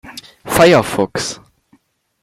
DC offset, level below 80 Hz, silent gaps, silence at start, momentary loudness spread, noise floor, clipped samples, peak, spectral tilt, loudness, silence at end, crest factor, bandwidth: under 0.1%; -46 dBFS; none; 0.05 s; 23 LU; -56 dBFS; under 0.1%; 0 dBFS; -4.5 dB/octave; -14 LUFS; 0.9 s; 16 dB; 16.5 kHz